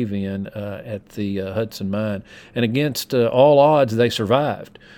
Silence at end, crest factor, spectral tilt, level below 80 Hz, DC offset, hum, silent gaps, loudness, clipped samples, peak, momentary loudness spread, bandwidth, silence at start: 0.3 s; 18 dB; -6 dB/octave; -58 dBFS; under 0.1%; none; none; -19 LUFS; under 0.1%; -2 dBFS; 17 LU; 19 kHz; 0 s